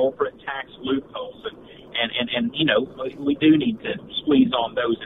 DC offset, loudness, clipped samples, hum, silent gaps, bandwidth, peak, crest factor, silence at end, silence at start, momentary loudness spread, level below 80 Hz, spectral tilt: under 0.1%; -22 LUFS; under 0.1%; none; none; 4 kHz; -4 dBFS; 18 dB; 0 s; 0 s; 14 LU; -56 dBFS; -8 dB/octave